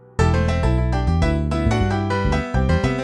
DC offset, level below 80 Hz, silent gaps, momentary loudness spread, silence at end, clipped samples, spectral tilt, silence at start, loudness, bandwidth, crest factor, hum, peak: under 0.1%; -24 dBFS; none; 2 LU; 0 s; under 0.1%; -7 dB/octave; 0.2 s; -20 LUFS; 10 kHz; 14 dB; none; -4 dBFS